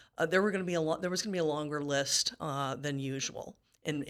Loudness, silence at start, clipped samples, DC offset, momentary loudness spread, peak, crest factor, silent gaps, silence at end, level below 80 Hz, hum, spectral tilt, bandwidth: -32 LUFS; 0.2 s; under 0.1%; under 0.1%; 9 LU; -14 dBFS; 20 dB; none; 0 s; -70 dBFS; none; -3.5 dB/octave; 18 kHz